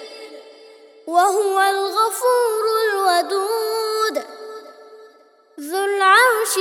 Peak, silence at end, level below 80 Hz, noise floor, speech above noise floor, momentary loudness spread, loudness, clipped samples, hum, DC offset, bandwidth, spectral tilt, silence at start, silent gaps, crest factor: -2 dBFS; 0 s; -82 dBFS; -52 dBFS; 34 dB; 23 LU; -18 LUFS; under 0.1%; none; under 0.1%; 19 kHz; 1 dB/octave; 0 s; none; 18 dB